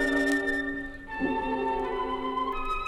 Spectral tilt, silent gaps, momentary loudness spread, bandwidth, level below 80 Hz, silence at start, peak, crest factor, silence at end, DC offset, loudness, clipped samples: -4.5 dB/octave; none; 8 LU; 13.5 kHz; -44 dBFS; 0 s; -12 dBFS; 16 dB; 0 s; under 0.1%; -29 LUFS; under 0.1%